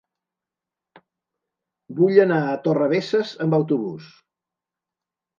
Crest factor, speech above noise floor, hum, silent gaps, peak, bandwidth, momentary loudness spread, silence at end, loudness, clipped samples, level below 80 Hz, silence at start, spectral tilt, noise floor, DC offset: 22 dB; 68 dB; none; none; -2 dBFS; 7.2 kHz; 14 LU; 1.35 s; -20 LUFS; under 0.1%; -74 dBFS; 1.9 s; -8 dB/octave; -88 dBFS; under 0.1%